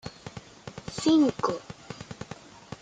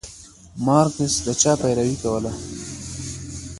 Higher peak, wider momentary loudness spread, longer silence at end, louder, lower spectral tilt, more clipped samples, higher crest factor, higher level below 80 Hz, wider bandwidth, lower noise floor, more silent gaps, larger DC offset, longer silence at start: second, -10 dBFS vs -2 dBFS; first, 22 LU vs 15 LU; about the same, 0.05 s vs 0 s; second, -26 LUFS vs -21 LUFS; about the same, -5.5 dB/octave vs -4.5 dB/octave; neither; about the same, 20 dB vs 22 dB; second, -60 dBFS vs -44 dBFS; second, 9.4 kHz vs 11.5 kHz; about the same, -46 dBFS vs -44 dBFS; neither; neither; about the same, 0.05 s vs 0.05 s